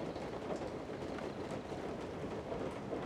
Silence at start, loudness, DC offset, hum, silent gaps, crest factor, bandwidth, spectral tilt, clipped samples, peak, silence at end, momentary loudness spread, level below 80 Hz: 0 s; -43 LUFS; under 0.1%; none; none; 16 dB; 15.5 kHz; -6.5 dB/octave; under 0.1%; -26 dBFS; 0 s; 2 LU; -60 dBFS